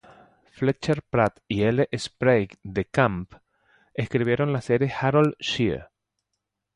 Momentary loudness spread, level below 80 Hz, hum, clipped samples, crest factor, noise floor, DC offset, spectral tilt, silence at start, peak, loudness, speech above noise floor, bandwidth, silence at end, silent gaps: 9 LU; -52 dBFS; none; under 0.1%; 20 dB; -81 dBFS; under 0.1%; -6.5 dB/octave; 0.6 s; -6 dBFS; -24 LUFS; 58 dB; 11.5 kHz; 0.9 s; none